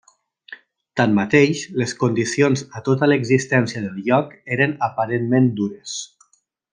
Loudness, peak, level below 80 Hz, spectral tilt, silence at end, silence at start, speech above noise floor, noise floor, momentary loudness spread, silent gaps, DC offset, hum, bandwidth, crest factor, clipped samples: -19 LUFS; -2 dBFS; -62 dBFS; -6 dB/octave; 0.65 s; 0.5 s; 45 dB; -64 dBFS; 10 LU; none; under 0.1%; none; 10 kHz; 18 dB; under 0.1%